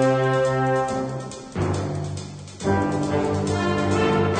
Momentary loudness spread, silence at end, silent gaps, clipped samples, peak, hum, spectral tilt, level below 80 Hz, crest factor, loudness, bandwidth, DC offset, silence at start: 11 LU; 0 s; none; under 0.1%; -8 dBFS; none; -6.5 dB/octave; -48 dBFS; 14 dB; -23 LUFS; 9.4 kHz; under 0.1%; 0 s